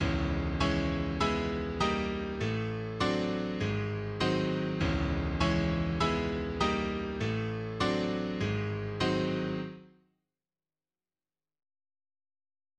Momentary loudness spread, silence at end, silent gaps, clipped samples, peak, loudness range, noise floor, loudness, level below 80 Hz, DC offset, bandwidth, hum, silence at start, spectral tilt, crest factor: 5 LU; 2.9 s; none; under 0.1%; -12 dBFS; 6 LU; under -90 dBFS; -32 LUFS; -42 dBFS; under 0.1%; 9.6 kHz; none; 0 s; -6.5 dB/octave; 20 dB